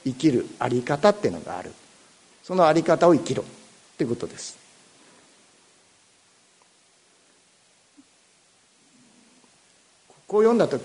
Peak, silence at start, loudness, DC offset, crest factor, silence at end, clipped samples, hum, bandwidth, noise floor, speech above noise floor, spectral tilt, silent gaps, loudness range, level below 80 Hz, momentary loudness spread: -4 dBFS; 0.05 s; -22 LUFS; under 0.1%; 22 dB; 0 s; under 0.1%; none; 11 kHz; -60 dBFS; 38 dB; -6 dB/octave; none; 14 LU; -66 dBFS; 18 LU